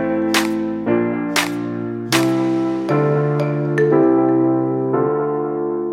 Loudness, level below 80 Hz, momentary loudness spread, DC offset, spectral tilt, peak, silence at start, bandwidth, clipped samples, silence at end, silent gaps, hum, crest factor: -18 LUFS; -56 dBFS; 7 LU; under 0.1%; -5.5 dB/octave; -2 dBFS; 0 s; 16.5 kHz; under 0.1%; 0 s; none; none; 16 dB